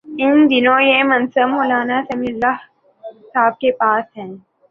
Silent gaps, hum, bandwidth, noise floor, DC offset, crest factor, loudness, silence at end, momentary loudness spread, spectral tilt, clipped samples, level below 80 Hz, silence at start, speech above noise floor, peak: none; none; 5 kHz; -38 dBFS; under 0.1%; 14 dB; -15 LUFS; 0.35 s; 12 LU; -6.5 dB/octave; under 0.1%; -58 dBFS; 0.05 s; 22 dB; -2 dBFS